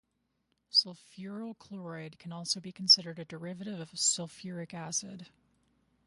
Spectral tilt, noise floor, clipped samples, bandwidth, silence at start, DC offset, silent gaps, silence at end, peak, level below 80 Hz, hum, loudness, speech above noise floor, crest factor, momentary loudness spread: -2 dB/octave; -79 dBFS; under 0.1%; 11.5 kHz; 0.75 s; under 0.1%; none; 0.8 s; -10 dBFS; -78 dBFS; none; -29 LUFS; 44 dB; 26 dB; 21 LU